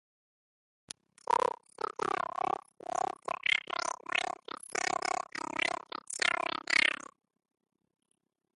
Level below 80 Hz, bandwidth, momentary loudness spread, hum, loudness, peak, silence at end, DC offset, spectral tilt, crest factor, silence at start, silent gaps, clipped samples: -76 dBFS; 11.5 kHz; 12 LU; none; -33 LUFS; -12 dBFS; 1.6 s; under 0.1%; -0.5 dB/octave; 24 dB; 1.3 s; none; under 0.1%